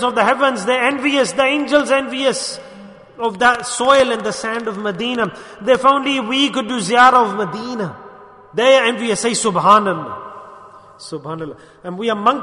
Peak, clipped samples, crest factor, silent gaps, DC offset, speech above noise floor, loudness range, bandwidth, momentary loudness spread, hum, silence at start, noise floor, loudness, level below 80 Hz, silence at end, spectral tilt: 0 dBFS; under 0.1%; 16 dB; none; under 0.1%; 24 dB; 3 LU; 11 kHz; 17 LU; none; 0 s; -40 dBFS; -16 LUFS; -56 dBFS; 0 s; -3 dB/octave